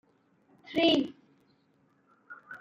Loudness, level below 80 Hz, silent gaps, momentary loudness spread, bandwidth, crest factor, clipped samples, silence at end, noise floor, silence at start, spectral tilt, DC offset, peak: -28 LUFS; -74 dBFS; none; 26 LU; 7.6 kHz; 20 dB; under 0.1%; 0.05 s; -68 dBFS; 0.7 s; -5 dB/octave; under 0.1%; -12 dBFS